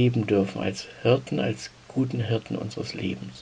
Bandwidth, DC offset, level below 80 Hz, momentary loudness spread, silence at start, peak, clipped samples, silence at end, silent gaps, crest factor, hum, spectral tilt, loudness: 9.6 kHz; under 0.1%; -60 dBFS; 9 LU; 0 s; -6 dBFS; under 0.1%; 0 s; none; 20 dB; none; -6.5 dB/octave; -27 LUFS